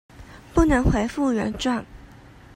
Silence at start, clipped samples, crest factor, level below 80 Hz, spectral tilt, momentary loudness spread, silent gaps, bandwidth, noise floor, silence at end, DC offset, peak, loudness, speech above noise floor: 0.2 s; under 0.1%; 18 dB; -32 dBFS; -6 dB/octave; 7 LU; none; 15.5 kHz; -47 dBFS; 0.55 s; under 0.1%; -4 dBFS; -22 LUFS; 26 dB